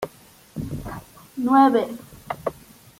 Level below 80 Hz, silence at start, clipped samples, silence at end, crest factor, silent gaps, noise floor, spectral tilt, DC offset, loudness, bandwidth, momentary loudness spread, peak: -50 dBFS; 0 s; under 0.1%; 0.5 s; 20 dB; none; -50 dBFS; -6.5 dB/octave; under 0.1%; -22 LUFS; 16.5 kHz; 22 LU; -4 dBFS